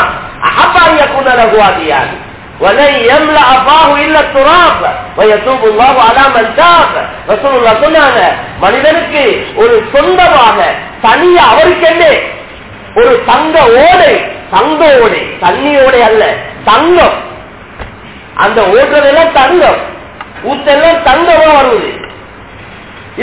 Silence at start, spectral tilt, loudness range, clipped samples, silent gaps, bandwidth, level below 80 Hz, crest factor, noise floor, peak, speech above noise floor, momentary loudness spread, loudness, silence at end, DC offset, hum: 0 s; -8 dB/octave; 3 LU; 2%; none; 4 kHz; -34 dBFS; 6 dB; -29 dBFS; 0 dBFS; 23 dB; 12 LU; -6 LUFS; 0 s; under 0.1%; none